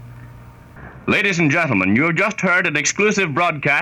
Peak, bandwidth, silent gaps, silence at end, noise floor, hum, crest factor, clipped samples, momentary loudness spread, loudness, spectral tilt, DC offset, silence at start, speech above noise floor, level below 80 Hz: -4 dBFS; 13.5 kHz; none; 0 s; -40 dBFS; none; 14 dB; under 0.1%; 2 LU; -16 LUFS; -4.5 dB/octave; under 0.1%; 0 s; 23 dB; -50 dBFS